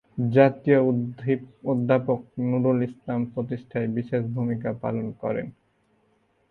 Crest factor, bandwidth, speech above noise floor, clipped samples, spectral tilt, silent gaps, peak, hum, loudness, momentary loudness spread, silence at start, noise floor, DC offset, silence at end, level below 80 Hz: 22 dB; 4.5 kHz; 42 dB; under 0.1%; -10.5 dB/octave; none; -4 dBFS; none; -25 LUFS; 10 LU; 0.15 s; -66 dBFS; under 0.1%; 1 s; -62 dBFS